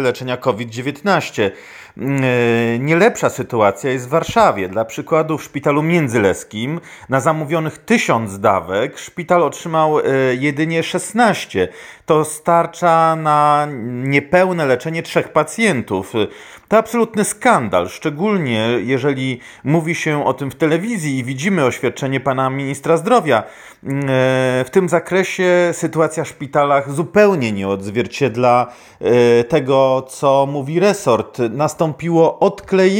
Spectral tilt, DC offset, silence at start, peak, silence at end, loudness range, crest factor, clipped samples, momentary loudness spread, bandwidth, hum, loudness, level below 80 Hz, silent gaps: -5.5 dB/octave; under 0.1%; 0 s; 0 dBFS; 0 s; 3 LU; 16 dB; under 0.1%; 8 LU; 17 kHz; none; -16 LUFS; -54 dBFS; none